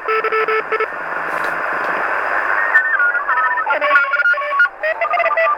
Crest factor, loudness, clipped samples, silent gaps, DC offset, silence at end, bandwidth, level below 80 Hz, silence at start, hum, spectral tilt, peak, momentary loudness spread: 16 dB; -16 LUFS; under 0.1%; none; under 0.1%; 0 s; 17.5 kHz; -60 dBFS; 0 s; none; -3 dB/octave; 0 dBFS; 7 LU